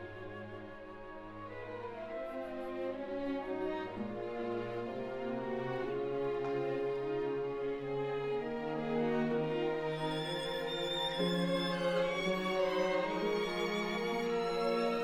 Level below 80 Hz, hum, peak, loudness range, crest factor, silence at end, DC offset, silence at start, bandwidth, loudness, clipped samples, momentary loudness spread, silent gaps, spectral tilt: -60 dBFS; none; -20 dBFS; 7 LU; 16 dB; 0 s; under 0.1%; 0 s; 15 kHz; -36 LUFS; under 0.1%; 11 LU; none; -5.5 dB/octave